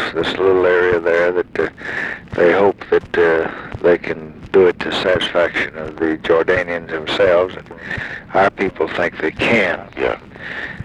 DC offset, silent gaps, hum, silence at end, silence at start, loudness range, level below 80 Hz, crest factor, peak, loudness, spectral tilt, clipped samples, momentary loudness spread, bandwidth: under 0.1%; none; none; 0 s; 0 s; 2 LU; -44 dBFS; 16 dB; -2 dBFS; -17 LUFS; -5.5 dB/octave; under 0.1%; 11 LU; 10 kHz